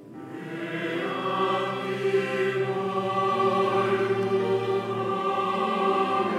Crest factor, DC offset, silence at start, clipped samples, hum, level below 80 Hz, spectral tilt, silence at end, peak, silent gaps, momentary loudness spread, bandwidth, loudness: 14 dB; under 0.1%; 0 s; under 0.1%; none; -74 dBFS; -6 dB/octave; 0 s; -12 dBFS; none; 6 LU; 11.5 kHz; -26 LUFS